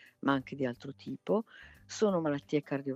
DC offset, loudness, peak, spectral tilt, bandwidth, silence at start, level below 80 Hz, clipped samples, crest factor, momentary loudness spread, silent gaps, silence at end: under 0.1%; -33 LUFS; -14 dBFS; -6 dB/octave; 8.2 kHz; 0.25 s; -70 dBFS; under 0.1%; 20 dB; 14 LU; none; 0 s